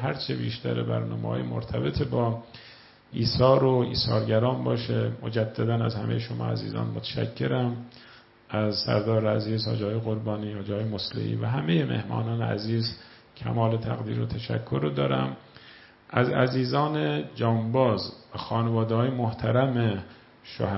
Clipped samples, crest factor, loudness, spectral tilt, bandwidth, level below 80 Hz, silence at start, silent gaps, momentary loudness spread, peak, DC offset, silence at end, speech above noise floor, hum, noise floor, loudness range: under 0.1%; 22 dB; -27 LUFS; -10 dB/octave; 5.8 kHz; -54 dBFS; 0 s; none; 8 LU; -4 dBFS; under 0.1%; 0 s; 25 dB; none; -51 dBFS; 4 LU